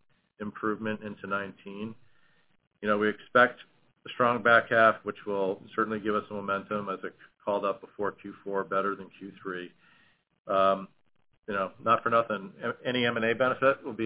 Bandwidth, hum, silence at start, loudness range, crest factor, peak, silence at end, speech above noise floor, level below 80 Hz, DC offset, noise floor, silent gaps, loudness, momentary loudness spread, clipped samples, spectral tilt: 4 kHz; none; 0.4 s; 8 LU; 22 dB; -8 dBFS; 0 s; 38 dB; -70 dBFS; under 0.1%; -67 dBFS; 10.40-10.45 s; -28 LUFS; 17 LU; under 0.1%; -3 dB/octave